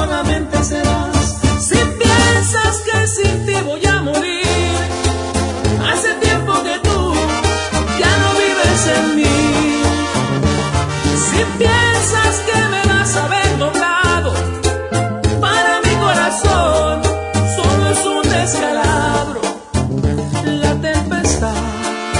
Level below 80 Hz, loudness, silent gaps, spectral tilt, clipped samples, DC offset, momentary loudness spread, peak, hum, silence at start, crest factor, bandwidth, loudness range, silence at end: -30 dBFS; -15 LUFS; none; -4 dB/octave; under 0.1%; under 0.1%; 5 LU; 0 dBFS; none; 0 s; 14 dB; 11 kHz; 2 LU; 0 s